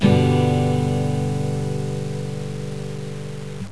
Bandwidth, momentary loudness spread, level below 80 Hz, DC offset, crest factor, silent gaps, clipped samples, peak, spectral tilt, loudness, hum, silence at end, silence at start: 11 kHz; 13 LU; -48 dBFS; 2%; 18 dB; none; under 0.1%; -4 dBFS; -7.5 dB/octave; -23 LUFS; none; 0 s; 0 s